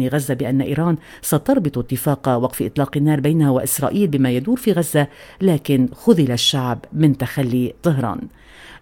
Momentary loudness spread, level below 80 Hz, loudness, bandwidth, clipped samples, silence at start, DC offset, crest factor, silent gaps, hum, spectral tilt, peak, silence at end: 6 LU; -48 dBFS; -18 LUFS; 17.5 kHz; under 0.1%; 0 s; under 0.1%; 18 dB; none; none; -5.5 dB/octave; 0 dBFS; 0.05 s